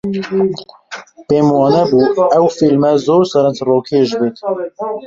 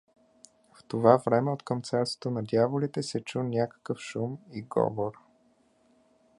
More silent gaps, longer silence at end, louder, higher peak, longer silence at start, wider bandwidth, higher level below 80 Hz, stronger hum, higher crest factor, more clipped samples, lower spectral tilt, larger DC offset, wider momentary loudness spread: neither; second, 0 s vs 1.25 s; first, -13 LUFS vs -29 LUFS; about the same, -2 dBFS vs -4 dBFS; second, 0.05 s vs 0.9 s; second, 7.8 kHz vs 11.5 kHz; first, -54 dBFS vs -68 dBFS; neither; second, 12 dB vs 26 dB; neither; about the same, -7 dB/octave vs -6.5 dB/octave; neither; about the same, 13 LU vs 13 LU